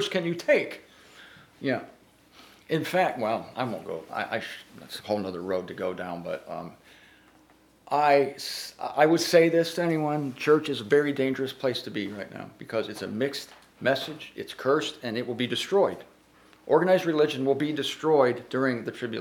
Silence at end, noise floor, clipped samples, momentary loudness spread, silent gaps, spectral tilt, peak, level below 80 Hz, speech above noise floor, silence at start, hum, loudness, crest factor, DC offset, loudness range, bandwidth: 0 s; -59 dBFS; under 0.1%; 15 LU; none; -5 dB/octave; -6 dBFS; -72 dBFS; 33 dB; 0 s; none; -27 LUFS; 22 dB; under 0.1%; 9 LU; 19 kHz